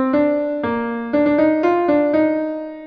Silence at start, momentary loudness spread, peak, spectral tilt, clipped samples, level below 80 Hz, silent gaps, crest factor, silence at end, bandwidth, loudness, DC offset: 0 s; 7 LU; -6 dBFS; -8.5 dB/octave; under 0.1%; -54 dBFS; none; 12 dB; 0 s; 5.2 kHz; -18 LUFS; under 0.1%